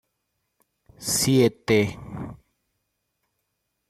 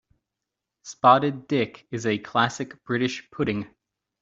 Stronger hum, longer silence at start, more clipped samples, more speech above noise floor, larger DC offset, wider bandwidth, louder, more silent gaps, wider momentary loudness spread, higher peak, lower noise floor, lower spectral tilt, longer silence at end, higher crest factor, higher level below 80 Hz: neither; first, 1 s vs 0.85 s; neither; second, 56 dB vs 61 dB; neither; first, 16 kHz vs 8 kHz; about the same, -22 LUFS vs -24 LUFS; neither; first, 18 LU vs 14 LU; second, -8 dBFS vs -4 dBFS; second, -77 dBFS vs -85 dBFS; about the same, -4.5 dB/octave vs -5 dB/octave; first, 1.55 s vs 0.55 s; about the same, 20 dB vs 22 dB; first, -56 dBFS vs -62 dBFS